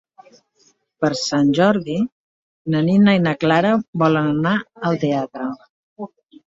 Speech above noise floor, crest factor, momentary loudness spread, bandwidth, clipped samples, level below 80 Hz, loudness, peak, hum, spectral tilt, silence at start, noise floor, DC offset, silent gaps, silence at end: 43 dB; 16 dB; 18 LU; 7.8 kHz; under 0.1%; -58 dBFS; -18 LUFS; -2 dBFS; none; -6.5 dB/octave; 1 s; -60 dBFS; under 0.1%; 2.12-2.65 s, 3.88-3.93 s, 5.70-5.96 s; 0.4 s